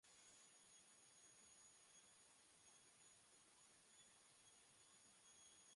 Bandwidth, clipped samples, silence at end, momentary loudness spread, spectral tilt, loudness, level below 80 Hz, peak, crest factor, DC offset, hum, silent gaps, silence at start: 11.5 kHz; under 0.1%; 0 s; 3 LU; 0 dB/octave; -68 LUFS; under -90 dBFS; -56 dBFS; 14 dB; under 0.1%; none; none; 0.05 s